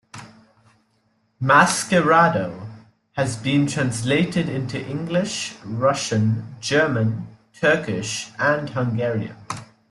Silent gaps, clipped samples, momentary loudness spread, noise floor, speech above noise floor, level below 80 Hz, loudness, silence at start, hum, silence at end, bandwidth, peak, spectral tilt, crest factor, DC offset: none; under 0.1%; 17 LU; -66 dBFS; 45 dB; -56 dBFS; -21 LUFS; 0.15 s; none; 0.25 s; 12.5 kHz; -2 dBFS; -5 dB/octave; 20 dB; under 0.1%